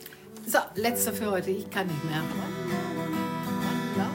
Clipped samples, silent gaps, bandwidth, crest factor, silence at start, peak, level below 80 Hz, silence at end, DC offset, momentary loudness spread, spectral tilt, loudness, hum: under 0.1%; none; 16.5 kHz; 20 dB; 0 s; -10 dBFS; -62 dBFS; 0 s; under 0.1%; 6 LU; -4.5 dB/octave; -29 LUFS; none